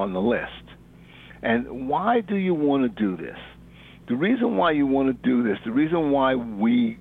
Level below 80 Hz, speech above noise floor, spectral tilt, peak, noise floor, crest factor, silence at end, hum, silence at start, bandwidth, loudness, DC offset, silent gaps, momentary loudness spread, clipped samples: -52 dBFS; 25 dB; -9 dB/octave; -8 dBFS; -48 dBFS; 14 dB; 0 s; none; 0 s; 4.1 kHz; -23 LUFS; under 0.1%; none; 9 LU; under 0.1%